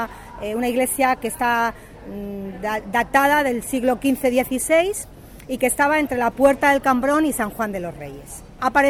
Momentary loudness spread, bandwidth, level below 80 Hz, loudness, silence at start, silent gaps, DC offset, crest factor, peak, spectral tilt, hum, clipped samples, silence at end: 15 LU; 18 kHz; -46 dBFS; -20 LUFS; 0 s; none; under 0.1%; 16 dB; -4 dBFS; -3.5 dB/octave; none; under 0.1%; 0 s